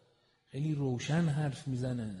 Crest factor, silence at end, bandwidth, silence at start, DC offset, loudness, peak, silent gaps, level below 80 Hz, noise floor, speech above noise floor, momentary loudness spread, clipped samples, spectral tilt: 16 dB; 0 s; 11.5 kHz; 0.55 s; under 0.1%; -34 LUFS; -18 dBFS; none; -64 dBFS; -70 dBFS; 37 dB; 6 LU; under 0.1%; -7 dB/octave